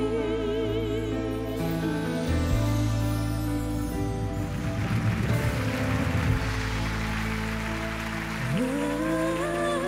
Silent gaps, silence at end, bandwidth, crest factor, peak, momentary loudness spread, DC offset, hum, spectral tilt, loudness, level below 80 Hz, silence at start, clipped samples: none; 0 s; 16 kHz; 14 dB; -12 dBFS; 4 LU; under 0.1%; none; -6.5 dB/octave; -28 LUFS; -36 dBFS; 0 s; under 0.1%